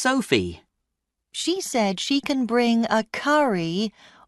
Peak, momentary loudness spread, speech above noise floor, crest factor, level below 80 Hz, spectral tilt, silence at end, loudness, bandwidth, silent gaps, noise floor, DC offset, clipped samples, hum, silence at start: -6 dBFS; 8 LU; 58 dB; 18 dB; -58 dBFS; -4 dB/octave; 0.35 s; -23 LUFS; 12 kHz; none; -81 dBFS; under 0.1%; under 0.1%; none; 0 s